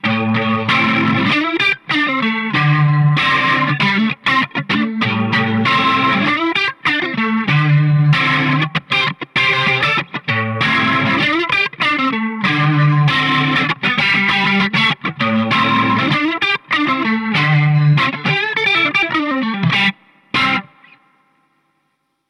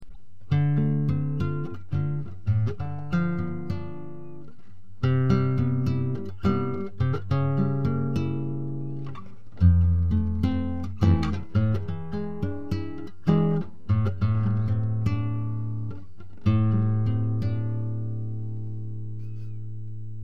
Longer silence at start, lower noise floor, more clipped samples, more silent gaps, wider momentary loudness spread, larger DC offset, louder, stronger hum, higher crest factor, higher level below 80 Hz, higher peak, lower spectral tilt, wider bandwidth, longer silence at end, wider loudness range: about the same, 0.05 s vs 0 s; first, -67 dBFS vs -51 dBFS; neither; neither; second, 4 LU vs 14 LU; second, under 0.1% vs 2%; first, -14 LUFS vs -27 LUFS; neither; second, 10 dB vs 20 dB; second, -54 dBFS vs -42 dBFS; about the same, -6 dBFS vs -6 dBFS; second, -6 dB/octave vs -9.5 dB/octave; first, 10 kHz vs 6.2 kHz; first, 1.65 s vs 0 s; second, 1 LU vs 4 LU